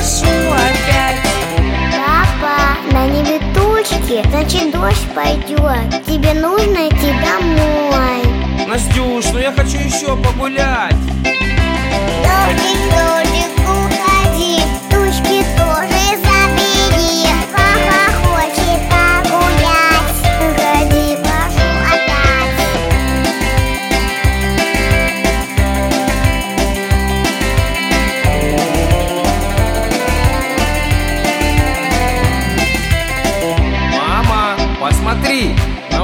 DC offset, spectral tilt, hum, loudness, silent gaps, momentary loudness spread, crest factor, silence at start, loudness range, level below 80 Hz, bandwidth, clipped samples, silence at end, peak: under 0.1%; -4.5 dB/octave; none; -13 LUFS; none; 4 LU; 12 dB; 0 s; 3 LU; -18 dBFS; 17 kHz; under 0.1%; 0 s; 0 dBFS